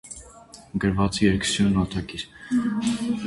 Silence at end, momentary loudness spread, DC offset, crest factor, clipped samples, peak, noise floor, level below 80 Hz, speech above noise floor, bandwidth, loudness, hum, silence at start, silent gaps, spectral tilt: 0 s; 13 LU; under 0.1%; 18 dB; under 0.1%; -6 dBFS; -47 dBFS; -42 dBFS; 24 dB; 11.5 kHz; -24 LUFS; none; 0.05 s; none; -5 dB/octave